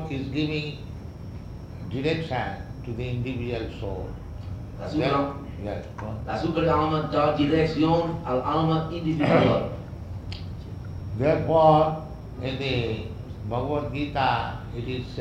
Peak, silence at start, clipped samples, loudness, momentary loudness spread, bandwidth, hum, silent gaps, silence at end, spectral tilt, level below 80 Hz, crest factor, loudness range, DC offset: -6 dBFS; 0 s; under 0.1%; -26 LUFS; 16 LU; 8.6 kHz; none; none; 0 s; -8 dB/octave; -42 dBFS; 20 dB; 8 LU; under 0.1%